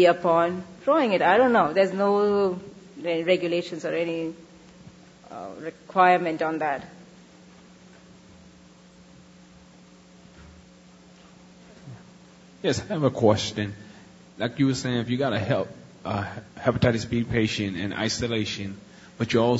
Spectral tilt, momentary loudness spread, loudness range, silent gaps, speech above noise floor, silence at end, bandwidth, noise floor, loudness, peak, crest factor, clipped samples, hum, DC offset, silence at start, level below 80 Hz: -5.5 dB/octave; 18 LU; 7 LU; none; 28 dB; 0 s; 8 kHz; -51 dBFS; -24 LUFS; -6 dBFS; 20 dB; under 0.1%; none; under 0.1%; 0 s; -56 dBFS